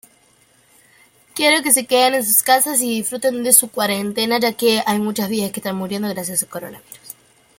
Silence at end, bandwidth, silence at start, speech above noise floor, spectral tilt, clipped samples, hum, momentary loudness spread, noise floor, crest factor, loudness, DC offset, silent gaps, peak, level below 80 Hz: 0.45 s; 17 kHz; 1.35 s; 37 dB; -2 dB/octave; under 0.1%; none; 13 LU; -55 dBFS; 20 dB; -16 LUFS; under 0.1%; none; 0 dBFS; -64 dBFS